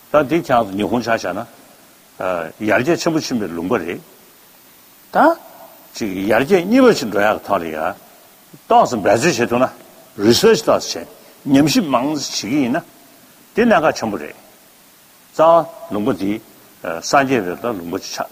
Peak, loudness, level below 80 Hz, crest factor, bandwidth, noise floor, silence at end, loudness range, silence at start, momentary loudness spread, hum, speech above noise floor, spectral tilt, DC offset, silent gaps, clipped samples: 0 dBFS; -17 LUFS; -54 dBFS; 18 dB; 15.5 kHz; -48 dBFS; 0.05 s; 5 LU; 0.15 s; 14 LU; none; 31 dB; -4.5 dB/octave; under 0.1%; none; under 0.1%